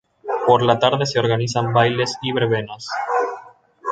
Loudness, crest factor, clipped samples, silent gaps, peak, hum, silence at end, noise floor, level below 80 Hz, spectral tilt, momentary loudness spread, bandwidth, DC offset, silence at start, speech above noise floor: -19 LUFS; 18 dB; under 0.1%; none; 0 dBFS; none; 0 s; -43 dBFS; -56 dBFS; -5 dB/octave; 11 LU; 9.2 kHz; under 0.1%; 0.25 s; 25 dB